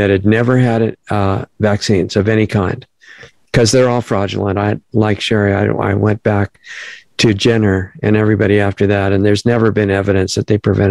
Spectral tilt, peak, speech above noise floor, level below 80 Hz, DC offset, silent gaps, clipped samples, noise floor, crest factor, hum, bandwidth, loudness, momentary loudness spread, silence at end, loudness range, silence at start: -6 dB/octave; 0 dBFS; 27 dB; -44 dBFS; 0.2%; none; under 0.1%; -40 dBFS; 14 dB; none; 12 kHz; -14 LUFS; 6 LU; 0 s; 2 LU; 0 s